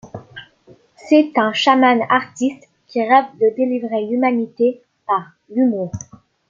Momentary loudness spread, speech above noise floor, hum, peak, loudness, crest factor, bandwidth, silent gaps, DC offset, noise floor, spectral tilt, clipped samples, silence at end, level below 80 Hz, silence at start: 13 LU; 33 dB; none; -2 dBFS; -17 LUFS; 16 dB; 7.6 kHz; none; under 0.1%; -50 dBFS; -5 dB/octave; under 0.1%; 0.45 s; -60 dBFS; 0.05 s